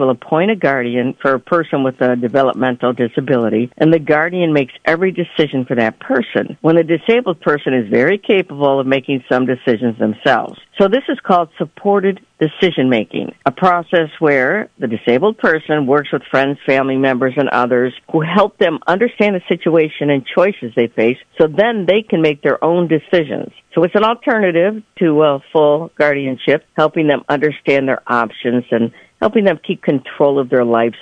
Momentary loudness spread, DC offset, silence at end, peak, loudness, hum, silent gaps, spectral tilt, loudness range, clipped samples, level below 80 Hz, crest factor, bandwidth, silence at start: 5 LU; under 0.1%; 0.05 s; 0 dBFS; -15 LUFS; none; none; -8 dB/octave; 1 LU; under 0.1%; -58 dBFS; 14 dB; 8.2 kHz; 0 s